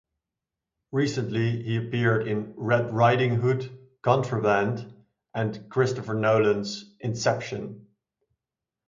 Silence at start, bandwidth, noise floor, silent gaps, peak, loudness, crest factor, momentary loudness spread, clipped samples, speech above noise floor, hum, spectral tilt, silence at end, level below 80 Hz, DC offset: 0.9 s; 7.6 kHz; -88 dBFS; none; -6 dBFS; -26 LUFS; 20 dB; 13 LU; under 0.1%; 64 dB; none; -6.5 dB/octave; 1.05 s; -62 dBFS; under 0.1%